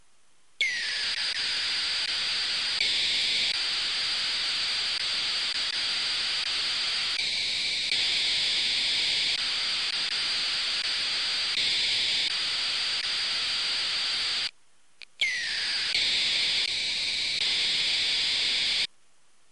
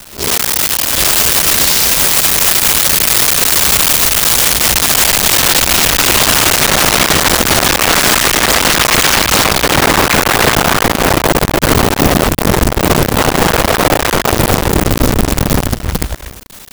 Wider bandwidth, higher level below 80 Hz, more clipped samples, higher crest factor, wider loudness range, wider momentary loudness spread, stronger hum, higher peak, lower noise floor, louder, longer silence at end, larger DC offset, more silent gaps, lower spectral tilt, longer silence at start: second, 11.5 kHz vs over 20 kHz; second, -62 dBFS vs -24 dBFS; neither; about the same, 14 dB vs 12 dB; about the same, 2 LU vs 4 LU; about the same, 3 LU vs 5 LU; neither; second, -14 dBFS vs 0 dBFS; first, -66 dBFS vs -31 dBFS; second, -25 LUFS vs -9 LUFS; first, 0.65 s vs 0.05 s; first, 0.2% vs under 0.1%; neither; second, 1.5 dB/octave vs -2.5 dB/octave; first, 0.6 s vs 0 s